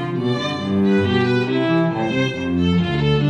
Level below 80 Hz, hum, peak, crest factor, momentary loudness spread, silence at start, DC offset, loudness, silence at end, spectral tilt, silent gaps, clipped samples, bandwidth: -42 dBFS; none; -4 dBFS; 14 dB; 4 LU; 0 s; under 0.1%; -19 LUFS; 0 s; -7.5 dB/octave; none; under 0.1%; 9.4 kHz